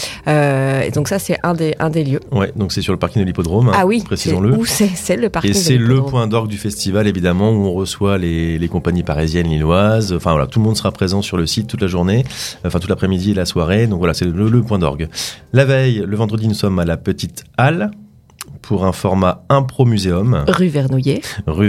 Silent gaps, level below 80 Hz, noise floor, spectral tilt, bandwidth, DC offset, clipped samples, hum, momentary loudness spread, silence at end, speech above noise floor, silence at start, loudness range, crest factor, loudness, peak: none; -38 dBFS; -36 dBFS; -6 dB/octave; 16 kHz; under 0.1%; under 0.1%; none; 6 LU; 0 s; 21 dB; 0 s; 2 LU; 14 dB; -16 LUFS; 0 dBFS